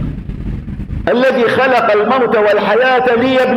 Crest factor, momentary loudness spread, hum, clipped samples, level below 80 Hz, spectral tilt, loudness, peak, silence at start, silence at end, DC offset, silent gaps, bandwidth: 12 dB; 13 LU; none; under 0.1%; -30 dBFS; -6.5 dB/octave; -12 LUFS; 0 dBFS; 0 s; 0 s; under 0.1%; none; 12 kHz